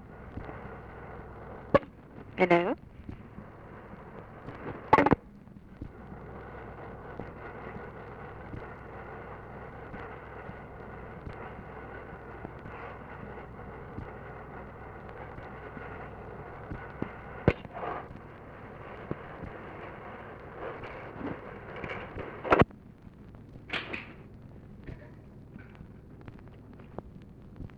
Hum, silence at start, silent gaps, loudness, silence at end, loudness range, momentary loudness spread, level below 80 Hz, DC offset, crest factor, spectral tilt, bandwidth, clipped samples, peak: none; 0 s; none; -35 LUFS; 0 s; 12 LU; 21 LU; -52 dBFS; under 0.1%; 30 dB; -8 dB/octave; 9.8 kHz; under 0.1%; -6 dBFS